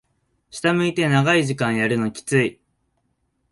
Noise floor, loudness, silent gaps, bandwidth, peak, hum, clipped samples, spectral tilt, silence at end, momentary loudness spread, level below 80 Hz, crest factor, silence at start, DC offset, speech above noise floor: -70 dBFS; -20 LUFS; none; 11.5 kHz; -4 dBFS; none; under 0.1%; -5.5 dB/octave; 1 s; 7 LU; -58 dBFS; 18 dB; 0.55 s; under 0.1%; 50 dB